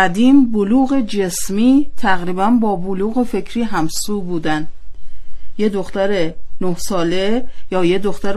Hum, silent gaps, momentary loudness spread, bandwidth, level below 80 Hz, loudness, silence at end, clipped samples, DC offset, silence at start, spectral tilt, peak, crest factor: none; none; 10 LU; 13.5 kHz; -36 dBFS; -17 LUFS; 0 s; under 0.1%; under 0.1%; 0 s; -5 dB/octave; 0 dBFS; 14 dB